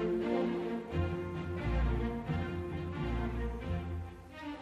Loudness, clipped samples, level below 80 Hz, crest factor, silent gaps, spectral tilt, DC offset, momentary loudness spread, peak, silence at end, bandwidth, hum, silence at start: -37 LUFS; under 0.1%; -40 dBFS; 14 dB; none; -8.5 dB/octave; under 0.1%; 8 LU; -20 dBFS; 0 s; 9.8 kHz; none; 0 s